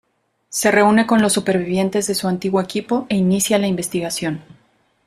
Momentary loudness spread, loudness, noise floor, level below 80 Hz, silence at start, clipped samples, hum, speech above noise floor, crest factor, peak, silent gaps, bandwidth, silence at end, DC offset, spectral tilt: 9 LU; -18 LUFS; -55 dBFS; -54 dBFS; 0.5 s; under 0.1%; none; 38 dB; 16 dB; -2 dBFS; none; 15.5 kHz; 0.65 s; under 0.1%; -4.5 dB/octave